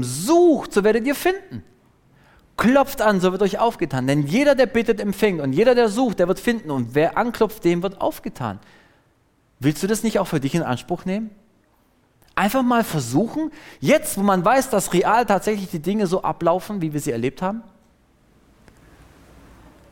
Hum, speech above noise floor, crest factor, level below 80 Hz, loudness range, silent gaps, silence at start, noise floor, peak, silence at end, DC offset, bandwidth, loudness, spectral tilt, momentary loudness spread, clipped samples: none; 41 dB; 16 dB; -48 dBFS; 6 LU; none; 0 s; -61 dBFS; -6 dBFS; 2.3 s; under 0.1%; 17 kHz; -20 LUFS; -5.5 dB/octave; 11 LU; under 0.1%